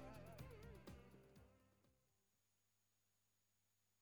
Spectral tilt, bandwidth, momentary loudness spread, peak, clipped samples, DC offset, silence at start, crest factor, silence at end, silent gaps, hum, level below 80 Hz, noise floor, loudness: -6 dB/octave; 19.5 kHz; 8 LU; -44 dBFS; under 0.1%; under 0.1%; 0 s; 20 dB; 0 s; none; none; -72 dBFS; -87 dBFS; -61 LUFS